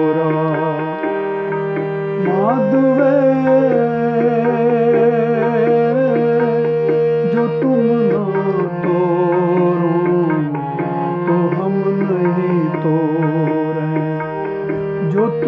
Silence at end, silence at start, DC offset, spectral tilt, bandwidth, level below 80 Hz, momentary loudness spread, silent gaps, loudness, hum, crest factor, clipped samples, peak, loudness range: 0 s; 0 s; under 0.1%; -10.5 dB/octave; 5.8 kHz; -60 dBFS; 7 LU; none; -16 LUFS; none; 12 dB; under 0.1%; -2 dBFS; 3 LU